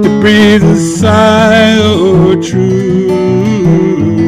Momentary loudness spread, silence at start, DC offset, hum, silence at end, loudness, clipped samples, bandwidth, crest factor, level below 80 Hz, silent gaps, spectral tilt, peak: 5 LU; 0 s; under 0.1%; none; 0 s; -7 LUFS; 1%; 14 kHz; 6 dB; -34 dBFS; none; -6 dB/octave; 0 dBFS